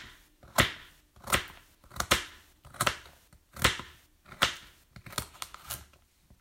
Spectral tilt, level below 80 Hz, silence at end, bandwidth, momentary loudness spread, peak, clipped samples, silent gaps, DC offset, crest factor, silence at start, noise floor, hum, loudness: -2 dB/octave; -50 dBFS; 0.6 s; 16.5 kHz; 22 LU; -6 dBFS; under 0.1%; none; under 0.1%; 28 dB; 0 s; -62 dBFS; none; -31 LUFS